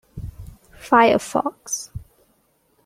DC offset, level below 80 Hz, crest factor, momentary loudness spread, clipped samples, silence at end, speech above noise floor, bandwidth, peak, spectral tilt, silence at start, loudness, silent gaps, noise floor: under 0.1%; -46 dBFS; 20 dB; 23 LU; under 0.1%; 0.85 s; 45 dB; 16 kHz; -2 dBFS; -4 dB/octave; 0.15 s; -19 LUFS; none; -63 dBFS